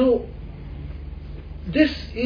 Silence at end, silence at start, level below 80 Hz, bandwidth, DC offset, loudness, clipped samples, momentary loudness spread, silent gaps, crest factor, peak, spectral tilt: 0 s; 0 s; -36 dBFS; 5.2 kHz; under 0.1%; -22 LUFS; under 0.1%; 17 LU; none; 20 dB; -4 dBFS; -8 dB/octave